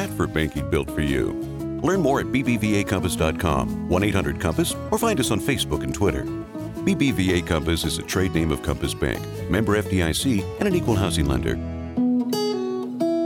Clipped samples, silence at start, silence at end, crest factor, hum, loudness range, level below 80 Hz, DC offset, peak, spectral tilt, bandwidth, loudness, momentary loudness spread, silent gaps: under 0.1%; 0 s; 0 s; 16 dB; none; 1 LU; -36 dBFS; under 0.1%; -8 dBFS; -5.5 dB/octave; 19 kHz; -23 LUFS; 5 LU; none